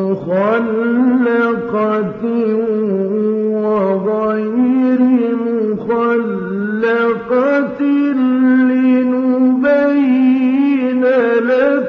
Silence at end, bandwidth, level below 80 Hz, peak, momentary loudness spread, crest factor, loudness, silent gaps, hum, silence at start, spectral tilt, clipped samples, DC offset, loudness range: 0 s; 4.9 kHz; -58 dBFS; -2 dBFS; 5 LU; 10 dB; -14 LUFS; none; none; 0 s; -9 dB/octave; under 0.1%; under 0.1%; 3 LU